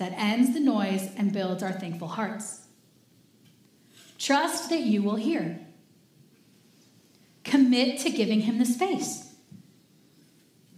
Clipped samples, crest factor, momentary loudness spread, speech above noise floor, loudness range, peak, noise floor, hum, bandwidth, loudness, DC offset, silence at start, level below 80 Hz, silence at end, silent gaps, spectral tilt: under 0.1%; 20 dB; 14 LU; 35 dB; 5 LU; -8 dBFS; -61 dBFS; none; 15.5 kHz; -26 LUFS; under 0.1%; 0 s; -86 dBFS; 1.5 s; none; -4.5 dB/octave